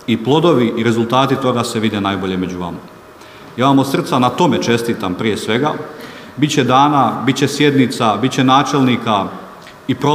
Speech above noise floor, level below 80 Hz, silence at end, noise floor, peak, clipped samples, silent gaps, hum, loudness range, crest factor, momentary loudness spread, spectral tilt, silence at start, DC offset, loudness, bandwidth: 24 dB; -54 dBFS; 0 s; -38 dBFS; 0 dBFS; under 0.1%; none; none; 3 LU; 14 dB; 14 LU; -5.5 dB/octave; 0 s; under 0.1%; -15 LUFS; 15.5 kHz